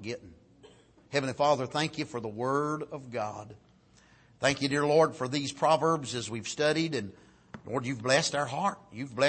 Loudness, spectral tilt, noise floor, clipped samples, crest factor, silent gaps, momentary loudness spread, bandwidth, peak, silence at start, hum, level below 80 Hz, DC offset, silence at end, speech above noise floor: -30 LUFS; -4.5 dB/octave; -61 dBFS; under 0.1%; 20 dB; none; 14 LU; 8.8 kHz; -10 dBFS; 0 s; none; -66 dBFS; under 0.1%; 0 s; 31 dB